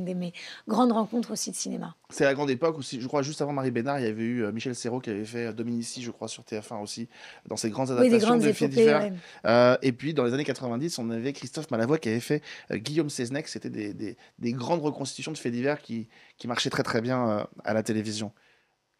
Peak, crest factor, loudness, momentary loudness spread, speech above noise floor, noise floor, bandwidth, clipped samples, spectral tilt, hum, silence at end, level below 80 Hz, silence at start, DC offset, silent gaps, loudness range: -8 dBFS; 20 dB; -28 LUFS; 15 LU; 40 dB; -68 dBFS; 14.5 kHz; under 0.1%; -5 dB/octave; none; 0.7 s; -72 dBFS; 0 s; under 0.1%; none; 8 LU